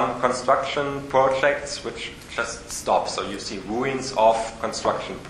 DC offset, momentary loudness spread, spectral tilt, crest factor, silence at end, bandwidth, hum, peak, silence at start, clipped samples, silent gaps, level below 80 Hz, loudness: under 0.1%; 10 LU; -3.5 dB/octave; 20 dB; 0 s; 13.5 kHz; none; -4 dBFS; 0 s; under 0.1%; none; -50 dBFS; -24 LUFS